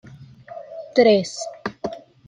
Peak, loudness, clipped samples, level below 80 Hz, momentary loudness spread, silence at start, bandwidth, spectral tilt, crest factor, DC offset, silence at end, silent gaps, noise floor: -2 dBFS; -20 LUFS; under 0.1%; -62 dBFS; 22 LU; 0.2 s; 10.5 kHz; -4.5 dB/octave; 20 dB; under 0.1%; 0.3 s; none; -42 dBFS